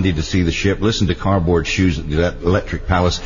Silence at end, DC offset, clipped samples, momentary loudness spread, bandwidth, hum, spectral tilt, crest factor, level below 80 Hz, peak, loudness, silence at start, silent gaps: 0 s; under 0.1%; under 0.1%; 3 LU; 7.4 kHz; none; -6 dB/octave; 14 dB; -28 dBFS; -4 dBFS; -18 LUFS; 0 s; none